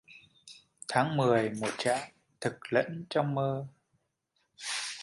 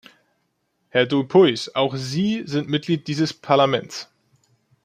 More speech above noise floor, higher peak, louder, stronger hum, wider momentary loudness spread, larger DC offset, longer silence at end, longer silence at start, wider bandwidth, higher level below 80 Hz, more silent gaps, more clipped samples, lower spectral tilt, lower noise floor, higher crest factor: about the same, 48 dB vs 51 dB; second, -12 dBFS vs -4 dBFS; second, -31 LUFS vs -20 LUFS; neither; first, 21 LU vs 9 LU; neither; second, 0 s vs 0.8 s; second, 0.1 s vs 0.95 s; first, 11.5 kHz vs 10 kHz; second, -72 dBFS vs -64 dBFS; neither; neither; about the same, -5 dB/octave vs -5.5 dB/octave; first, -78 dBFS vs -71 dBFS; about the same, 20 dB vs 18 dB